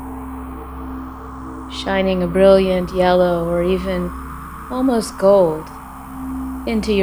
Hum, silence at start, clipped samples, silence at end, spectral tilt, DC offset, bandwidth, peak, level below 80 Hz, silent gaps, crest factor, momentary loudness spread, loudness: none; 0 s; under 0.1%; 0 s; -6.5 dB/octave; under 0.1%; over 20 kHz; 0 dBFS; -34 dBFS; none; 18 dB; 18 LU; -17 LUFS